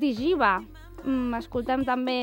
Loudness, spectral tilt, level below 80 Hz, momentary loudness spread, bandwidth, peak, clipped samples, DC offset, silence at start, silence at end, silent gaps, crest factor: -26 LUFS; -6 dB/octave; -48 dBFS; 8 LU; 16.5 kHz; -10 dBFS; under 0.1%; under 0.1%; 0 s; 0 s; none; 16 dB